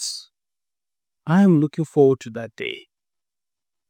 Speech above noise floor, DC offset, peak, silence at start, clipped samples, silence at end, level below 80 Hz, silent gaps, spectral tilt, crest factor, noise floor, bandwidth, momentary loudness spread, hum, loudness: over 71 dB; under 0.1%; -4 dBFS; 0 s; under 0.1%; 1.1 s; -74 dBFS; none; -6.5 dB/octave; 18 dB; under -90 dBFS; 14.5 kHz; 19 LU; none; -20 LUFS